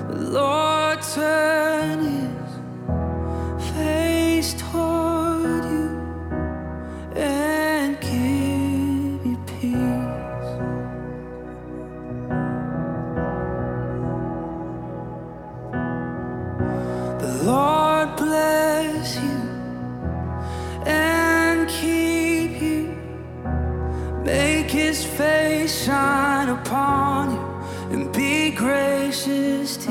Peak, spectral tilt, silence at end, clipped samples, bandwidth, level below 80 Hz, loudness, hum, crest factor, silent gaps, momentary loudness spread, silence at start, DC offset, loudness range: -8 dBFS; -5 dB/octave; 0 s; under 0.1%; 17.5 kHz; -38 dBFS; -22 LUFS; none; 16 dB; none; 12 LU; 0 s; under 0.1%; 7 LU